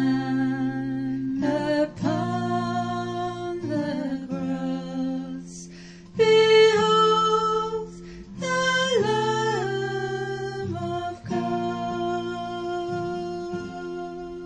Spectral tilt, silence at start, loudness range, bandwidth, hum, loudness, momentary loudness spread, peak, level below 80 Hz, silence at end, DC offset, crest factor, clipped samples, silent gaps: -5 dB/octave; 0 s; 8 LU; 9.8 kHz; none; -25 LUFS; 15 LU; -10 dBFS; -54 dBFS; 0 s; under 0.1%; 16 dB; under 0.1%; none